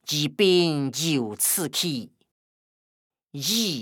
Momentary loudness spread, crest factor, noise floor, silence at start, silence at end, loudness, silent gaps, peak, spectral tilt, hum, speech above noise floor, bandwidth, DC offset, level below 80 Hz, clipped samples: 9 LU; 18 dB; under -90 dBFS; 0.05 s; 0 s; -23 LUFS; 2.31-3.10 s; -8 dBFS; -3.5 dB/octave; none; over 66 dB; over 20 kHz; under 0.1%; -82 dBFS; under 0.1%